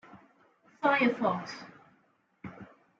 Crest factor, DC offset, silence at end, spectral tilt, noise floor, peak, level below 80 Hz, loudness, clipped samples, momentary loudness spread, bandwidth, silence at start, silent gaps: 20 dB; under 0.1%; 0.35 s; -6 dB/octave; -70 dBFS; -12 dBFS; -74 dBFS; -29 LUFS; under 0.1%; 24 LU; 7.6 kHz; 0.15 s; none